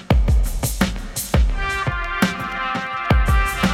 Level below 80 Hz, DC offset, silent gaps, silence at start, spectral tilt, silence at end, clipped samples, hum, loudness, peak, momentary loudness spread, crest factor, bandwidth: -22 dBFS; under 0.1%; none; 0 s; -5 dB/octave; 0 s; under 0.1%; none; -21 LUFS; -4 dBFS; 6 LU; 16 dB; 16.5 kHz